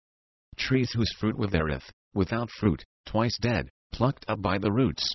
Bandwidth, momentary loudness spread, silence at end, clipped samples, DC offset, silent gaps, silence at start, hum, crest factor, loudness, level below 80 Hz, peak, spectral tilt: 6.2 kHz; 9 LU; 0 s; under 0.1%; under 0.1%; 1.93-2.11 s, 2.85-3.04 s, 3.70-3.90 s; 0.6 s; none; 18 dB; -28 LUFS; -44 dBFS; -10 dBFS; -6.5 dB/octave